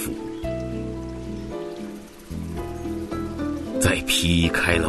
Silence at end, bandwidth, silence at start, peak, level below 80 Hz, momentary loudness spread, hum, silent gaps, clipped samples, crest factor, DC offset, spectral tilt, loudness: 0 s; 12.5 kHz; 0 s; -2 dBFS; -38 dBFS; 15 LU; none; none; under 0.1%; 22 dB; under 0.1%; -4 dB/octave; -25 LUFS